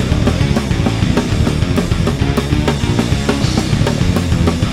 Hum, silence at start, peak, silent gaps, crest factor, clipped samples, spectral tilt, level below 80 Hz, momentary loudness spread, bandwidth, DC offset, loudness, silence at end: none; 0 s; 0 dBFS; none; 14 dB; under 0.1%; -6 dB/octave; -22 dBFS; 1 LU; 16 kHz; under 0.1%; -15 LUFS; 0 s